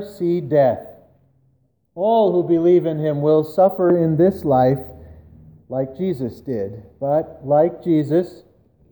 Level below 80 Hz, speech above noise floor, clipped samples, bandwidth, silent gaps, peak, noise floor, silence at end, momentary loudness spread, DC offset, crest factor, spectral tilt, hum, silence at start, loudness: -52 dBFS; 45 dB; under 0.1%; over 20 kHz; none; -4 dBFS; -62 dBFS; 0.55 s; 11 LU; under 0.1%; 16 dB; -9.5 dB/octave; none; 0 s; -19 LUFS